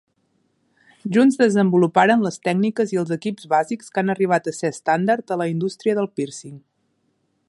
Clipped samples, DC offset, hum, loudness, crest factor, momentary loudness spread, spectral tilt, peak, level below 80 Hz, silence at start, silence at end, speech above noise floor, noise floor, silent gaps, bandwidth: under 0.1%; under 0.1%; none; -20 LUFS; 20 dB; 10 LU; -6 dB/octave; -2 dBFS; -70 dBFS; 1.05 s; 0.9 s; 49 dB; -68 dBFS; none; 11.5 kHz